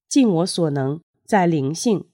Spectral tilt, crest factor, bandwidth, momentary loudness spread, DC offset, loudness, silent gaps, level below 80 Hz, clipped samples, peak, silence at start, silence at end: -5.5 dB/octave; 14 dB; 16.5 kHz; 8 LU; under 0.1%; -20 LUFS; 1.03-1.14 s; -70 dBFS; under 0.1%; -6 dBFS; 0.1 s; 0.1 s